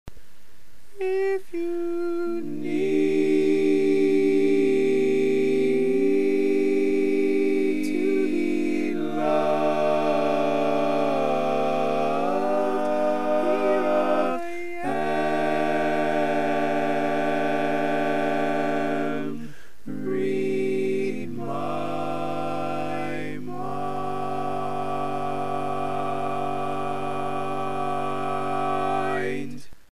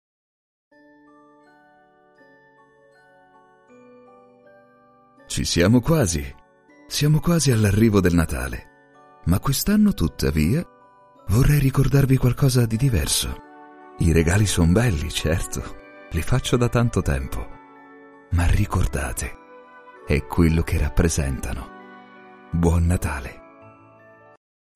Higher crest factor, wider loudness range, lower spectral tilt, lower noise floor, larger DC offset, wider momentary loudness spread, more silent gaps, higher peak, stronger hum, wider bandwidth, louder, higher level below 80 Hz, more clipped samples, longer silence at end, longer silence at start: about the same, 14 dB vs 18 dB; about the same, 7 LU vs 6 LU; about the same, -6.5 dB/octave vs -5.5 dB/octave; about the same, -57 dBFS vs -56 dBFS; first, 3% vs under 0.1%; second, 8 LU vs 15 LU; neither; second, -10 dBFS vs -4 dBFS; neither; second, 13.5 kHz vs 15.5 kHz; second, -25 LUFS vs -21 LUFS; second, -60 dBFS vs -32 dBFS; neither; second, 0 s vs 1.35 s; second, 0.05 s vs 5.3 s